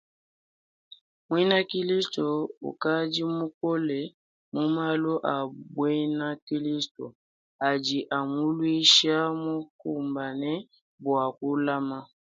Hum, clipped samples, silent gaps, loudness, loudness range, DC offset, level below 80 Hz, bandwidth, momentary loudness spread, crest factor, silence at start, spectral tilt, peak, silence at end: none; under 0.1%; 2.57-2.61 s, 3.54-3.61 s, 4.14-4.52 s, 6.42-6.47 s, 6.91-6.95 s, 7.15-7.59 s, 9.70-9.79 s, 10.81-10.98 s; -27 LUFS; 5 LU; under 0.1%; -76 dBFS; 9.4 kHz; 11 LU; 22 dB; 1.3 s; -4 dB/octave; -6 dBFS; 0.3 s